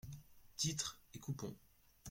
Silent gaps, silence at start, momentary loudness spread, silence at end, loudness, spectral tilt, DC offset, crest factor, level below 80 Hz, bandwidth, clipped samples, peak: none; 0.05 s; 19 LU; 0 s; -43 LUFS; -3 dB/octave; under 0.1%; 22 dB; -68 dBFS; 16.5 kHz; under 0.1%; -26 dBFS